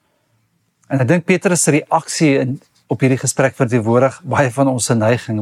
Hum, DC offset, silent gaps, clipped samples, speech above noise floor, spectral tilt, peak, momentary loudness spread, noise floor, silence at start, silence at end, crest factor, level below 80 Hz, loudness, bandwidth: none; under 0.1%; none; under 0.1%; 48 dB; -5.5 dB/octave; -2 dBFS; 5 LU; -63 dBFS; 0.9 s; 0 s; 14 dB; -60 dBFS; -16 LUFS; 14.5 kHz